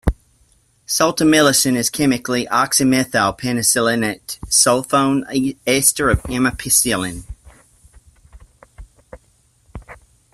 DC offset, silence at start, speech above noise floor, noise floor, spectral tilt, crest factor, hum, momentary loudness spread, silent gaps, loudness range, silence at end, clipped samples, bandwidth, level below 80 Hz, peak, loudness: under 0.1%; 0.05 s; 41 dB; -57 dBFS; -3 dB/octave; 18 dB; none; 9 LU; none; 6 LU; 0.4 s; under 0.1%; 15 kHz; -36 dBFS; 0 dBFS; -16 LUFS